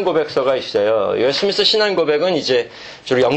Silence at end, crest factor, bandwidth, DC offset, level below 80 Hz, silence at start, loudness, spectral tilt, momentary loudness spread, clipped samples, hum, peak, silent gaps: 0 s; 14 dB; 8.6 kHz; under 0.1%; -56 dBFS; 0 s; -16 LUFS; -4 dB/octave; 6 LU; under 0.1%; none; -2 dBFS; none